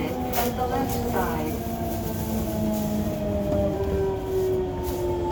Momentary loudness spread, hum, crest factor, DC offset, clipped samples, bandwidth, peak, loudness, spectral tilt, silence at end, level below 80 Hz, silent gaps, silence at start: 4 LU; none; 16 dB; under 0.1%; under 0.1%; over 20 kHz; -10 dBFS; -26 LUFS; -6.5 dB/octave; 0 s; -38 dBFS; none; 0 s